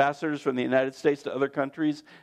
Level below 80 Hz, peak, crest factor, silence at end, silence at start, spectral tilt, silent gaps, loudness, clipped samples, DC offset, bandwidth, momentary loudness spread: -78 dBFS; -8 dBFS; 18 dB; 0.05 s; 0 s; -6 dB/octave; none; -27 LUFS; under 0.1%; under 0.1%; 10.5 kHz; 4 LU